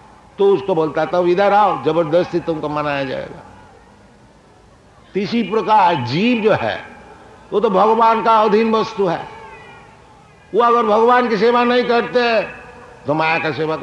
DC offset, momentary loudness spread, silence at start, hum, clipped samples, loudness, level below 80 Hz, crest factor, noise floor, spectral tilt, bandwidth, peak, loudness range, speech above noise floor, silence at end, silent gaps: under 0.1%; 12 LU; 0.4 s; none; under 0.1%; -16 LUFS; -54 dBFS; 14 dB; -47 dBFS; -6.5 dB/octave; 9.4 kHz; -2 dBFS; 6 LU; 32 dB; 0 s; none